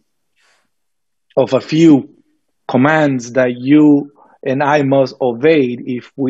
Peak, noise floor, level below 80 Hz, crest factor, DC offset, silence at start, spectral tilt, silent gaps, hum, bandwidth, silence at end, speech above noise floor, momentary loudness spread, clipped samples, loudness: 0 dBFS; -78 dBFS; -64 dBFS; 14 dB; under 0.1%; 1.35 s; -7 dB/octave; none; none; 7.8 kHz; 0 s; 66 dB; 12 LU; under 0.1%; -13 LUFS